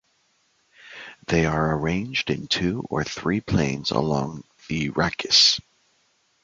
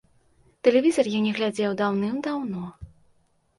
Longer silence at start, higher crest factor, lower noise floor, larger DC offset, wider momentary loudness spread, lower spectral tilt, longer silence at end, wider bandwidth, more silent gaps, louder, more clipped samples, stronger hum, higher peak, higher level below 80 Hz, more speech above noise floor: first, 0.85 s vs 0.65 s; about the same, 22 dB vs 20 dB; about the same, -66 dBFS vs -64 dBFS; neither; first, 17 LU vs 12 LU; second, -4 dB/octave vs -5.5 dB/octave; first, 0.85 s vs 0.7 s; second, 9.2 kHz vs 11.5 kHz; neither; about the same, -22 LUFS vs -24 LUFS; neither; neither; about the same, -4 dBFS vs -6 dBFS; first, -46 dBFS vs -58 dBFS; about the same, 43 dB vs 41 dB